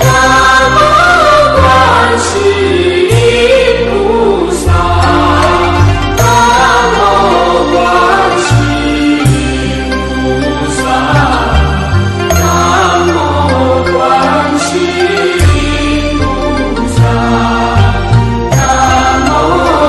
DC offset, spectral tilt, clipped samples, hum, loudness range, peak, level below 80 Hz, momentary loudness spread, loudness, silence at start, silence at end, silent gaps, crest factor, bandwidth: under 0.1%; -5 dB/octave; under 0.1%; none; 4 LU; 0 dBFS; -20 dBFS; 6 LU; -8 LUFS; 0 s; 0 s; none; 8 dB; 12.5 kHz